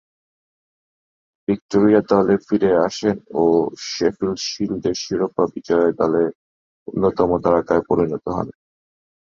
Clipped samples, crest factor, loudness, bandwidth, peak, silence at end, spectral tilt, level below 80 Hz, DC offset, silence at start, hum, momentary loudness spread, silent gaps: under 0.1%; 18 dB; -19 LUFS; 7.4 kHz; -2 dBFS; 0.85 s; -6 dB/octave; -50 dBFS; under 0.1%; 1.5 s; none; 8 LU; 1.61-1.69 s, 6.35-6.86 s